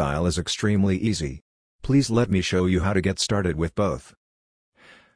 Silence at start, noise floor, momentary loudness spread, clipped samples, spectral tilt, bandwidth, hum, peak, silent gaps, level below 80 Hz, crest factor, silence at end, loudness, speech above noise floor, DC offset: 0 s; under -90 dBFS; 8 LU; under 0.1%; -5.5 dB/octave; 10.5 kHz; none; -6 dBFS; 1.42-1.79 s; -42 dBFS; 18 dB; 1.15 s; -23 LUFS; over 67 dB; under 0.1%